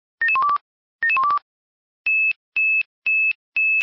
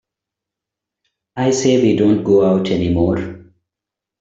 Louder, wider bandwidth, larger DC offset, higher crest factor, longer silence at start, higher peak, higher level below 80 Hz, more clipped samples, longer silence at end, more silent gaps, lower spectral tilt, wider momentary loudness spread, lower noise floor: second, -19 LUFS vs -15 LUFS; second, 5.8 kHz vs 8 kHz; neither; second, 8 dB vs 14 dB; second, 0.2 s vs 1.35 s; second, -14 dBFS vs -2 dBFS; second, -68 dBFS vs -48 dBFS; neither; second, 0 s vs 0.85 s; first, 0.61-0.99 s, 1.42-2.05 s, 2.36-2.52 s, 2.86-3.02 s, 3.35-3.52 s vs none; second, -1.5 dB/octave vs -6 dB/octave; second, 6 LU vs 9 LU; first, under -90 dBFS vs -85 dBFS